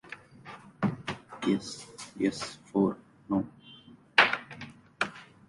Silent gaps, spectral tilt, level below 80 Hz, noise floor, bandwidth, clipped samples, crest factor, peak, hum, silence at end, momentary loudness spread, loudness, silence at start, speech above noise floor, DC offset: none; -4.5 dB/octave; -66 dBFS; -54 dBFS; 11.5 kHz; under 0.1%; 28 dB; -4 dBFS; none; 0.25 s; 23 LU; -30 LUFS; 0.05 s; 23 dB; under 0.1%